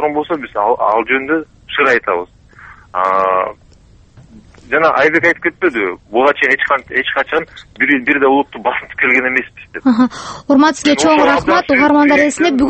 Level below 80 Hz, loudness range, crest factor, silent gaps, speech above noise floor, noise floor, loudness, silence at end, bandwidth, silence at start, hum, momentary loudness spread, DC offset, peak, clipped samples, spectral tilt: -46 dBFS; 5 LU; 14 dB; none; 31 dB; -45 dBFS; -13 LUFS; 0 s; 8.8 kHz; 0 s; none; 9 LU; under 0.1%; 0 dBFS; under 0.1%; -4 dB/octave